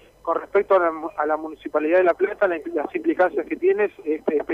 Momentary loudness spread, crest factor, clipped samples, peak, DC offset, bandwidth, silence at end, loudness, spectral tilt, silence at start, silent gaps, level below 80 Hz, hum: 8 LU; 16 dB; under 0.1%; -6 dBFS; under 0.1%; 5.2 kHz; 0 s; -22 LUFS; -7 dB/octave; 0.25 s; none; -60 dBFS; none